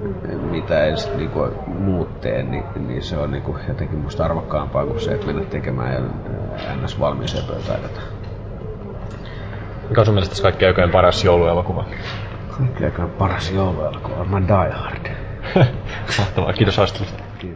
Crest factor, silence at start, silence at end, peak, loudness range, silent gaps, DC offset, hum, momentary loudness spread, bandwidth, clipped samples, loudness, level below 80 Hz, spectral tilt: 18 dB; 0 s; 0 s; -2 dBFS; 7 LU; none; under 0.1%; none; 15 LU; 8 kHz; under 0.1%; -20 LUFS; -32 dBFS; -7 dB/octave